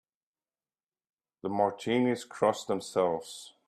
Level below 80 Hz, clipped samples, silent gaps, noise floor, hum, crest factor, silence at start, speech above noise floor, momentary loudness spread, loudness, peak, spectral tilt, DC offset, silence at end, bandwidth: -74 dBFS; under 0.1%; none; under -90 dBFS; none; 20 dB; 1.45 s; over 60 dB; 9 LU; -30 LUFS; -12 dBFS; -5 dB/octave; under 0.1%; 0.2 s; 13.5 kHz